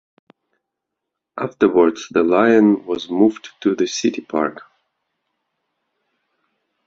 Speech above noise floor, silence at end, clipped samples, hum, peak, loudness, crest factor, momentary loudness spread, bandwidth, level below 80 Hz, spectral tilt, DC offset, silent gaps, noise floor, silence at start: 64 dB; 2.25 s; under 0.1%; none; 0 dBFS; -18 LUFS; 20 dB; 11 LU; 7.8 kHz; -62 dBFS; -5 dB/octave; under 0.1%; none; -81 dBFS; 1.35 s